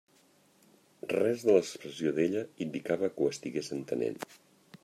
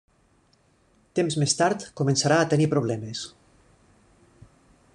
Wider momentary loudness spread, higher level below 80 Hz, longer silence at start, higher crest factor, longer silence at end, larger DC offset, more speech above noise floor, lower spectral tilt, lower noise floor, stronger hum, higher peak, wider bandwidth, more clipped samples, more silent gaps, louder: about the same, 12 LU vs 12 LU; second, -78 dBFS vs -62 dBFS; about the same, 1.05 s vs 1.15 s; about the same, 22 dB vs 20 dB; second, 0.1 s vs 1.65 s; neither; second, 34 dB vs 40 dB; about the same, -5.5 dB/octave vs -4.5 dB/octave; about the same, -65 dBFS vs -63 dBFS; neither; second, -10 dBFS vs -6 dBFS; first, 14.5 kHz vs 10.5 kHz; neither; neither; second, -31 LUFS vs -24 LUFS